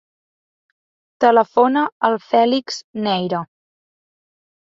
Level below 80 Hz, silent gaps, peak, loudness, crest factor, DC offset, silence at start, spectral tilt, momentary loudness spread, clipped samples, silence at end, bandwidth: -68 dBFS; 1.92-2.01 s, 2.84-2.94 s; -2 dBFS; -17 LUFS; 18 dB; under 0.1%; 1.2 s; -5 dB/octave; 11 LU; under 0.1%; 1.25 s; 7.8 kHz